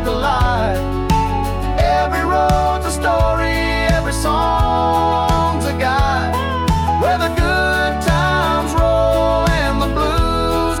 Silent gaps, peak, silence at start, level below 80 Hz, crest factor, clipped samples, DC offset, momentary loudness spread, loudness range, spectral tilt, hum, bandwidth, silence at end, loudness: none; -4 dBFS; 0 s; -22 dBFS; 10 dB; under 0.1%; under 0.1%; 3 LU; 1 LU; -5.5 dB/octave; none; 18 kHz; 0 s; -16 LUFS